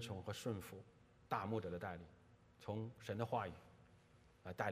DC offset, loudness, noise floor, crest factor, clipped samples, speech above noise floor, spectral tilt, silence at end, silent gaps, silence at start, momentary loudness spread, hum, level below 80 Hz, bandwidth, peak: under 0.1%; -47 LUFS; -69 dBFS; 24 dB; under 0.1%; 23 dB; -6 dB/octave; 0 s; none; 0 s; 19 LU; none; -76 dBFS; 15.5 kHz; -24 dBFS